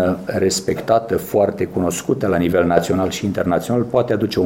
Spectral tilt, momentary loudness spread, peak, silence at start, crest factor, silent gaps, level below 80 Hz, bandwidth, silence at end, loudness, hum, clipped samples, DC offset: -5.5 dB/octave; 4 LU; 0 dBFS; 0 s; 18 dB; none; -46 dBFS; 16.5 kHz; 0 s; -18 LUFS; none; under 0.1%; under 0.1%